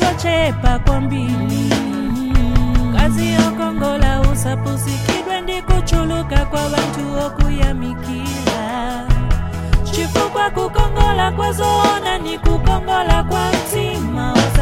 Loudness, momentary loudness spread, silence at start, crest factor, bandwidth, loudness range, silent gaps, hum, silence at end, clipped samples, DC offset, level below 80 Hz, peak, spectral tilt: -18 LUFS; 5 LU; 0 s; 14 dB; 16 kHz; 3 LU; none; none; 0 s; under 0.1%; under 0.1%; -20 dBFS; 0 dBFS; -5.5 dB/octave